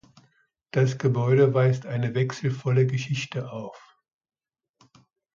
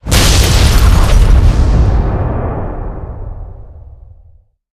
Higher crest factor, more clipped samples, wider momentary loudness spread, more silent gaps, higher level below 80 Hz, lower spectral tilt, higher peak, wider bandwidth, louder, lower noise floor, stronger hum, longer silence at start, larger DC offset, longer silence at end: first, 18 dB vs 10 dB; second, under 0.1% vs 0.4%; second, 13 LU vs 18 LU; neither; second, -66 dBFS vs -12 dBFS; first, -7 dB/octave vs -4.5 dB/octave; second, -8 dBFS vs 0 dBFS; second, 7.4 kHz vs 15 kHz; second, -24 LUFS vs -11 LUFS; first, -67 dBFS vs -44 dBFS; neither; first, 0.75 s vs 0.05 s; neither; first, 1.6 s vs 0.9 s